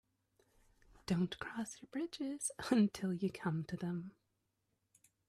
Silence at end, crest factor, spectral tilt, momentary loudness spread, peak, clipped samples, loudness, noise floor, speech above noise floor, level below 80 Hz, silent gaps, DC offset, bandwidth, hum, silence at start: 1.2 s; 20 dB; -5.5 dB/octave; 12 LU; -20 dBFS; under 0.1%; -39 LUFS; -84 dBFS; 46 dB; -72 dBFS; none; under 0.1%; 14.5 kHz; none; 1.1 s